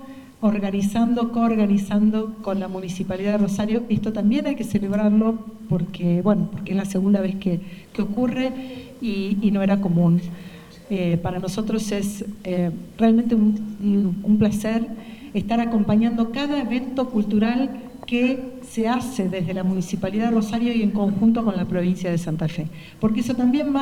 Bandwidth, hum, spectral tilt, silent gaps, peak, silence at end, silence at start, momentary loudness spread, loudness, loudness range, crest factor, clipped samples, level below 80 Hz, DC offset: 13.5 kHz; none; -7 dB/octave; none; -6 dBFS; 0 s; 0 s; 9 LU; -22 LUFS; 2 LU; 16 dB; under 0.1%; -48 dBFS; under 0.1%